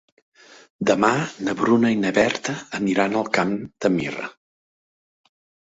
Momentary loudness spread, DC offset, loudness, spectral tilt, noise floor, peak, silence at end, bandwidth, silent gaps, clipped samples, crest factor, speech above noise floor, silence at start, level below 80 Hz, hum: 9 LU; under 0.1%; -21 LUFS; -5 dB/octave; under -90 dBFS; -2 dBFS; 1.35 s; 8 kHz; none; under 0.1%; 22 dB; over 69 dB; 0.8 s; -60 dBFS; none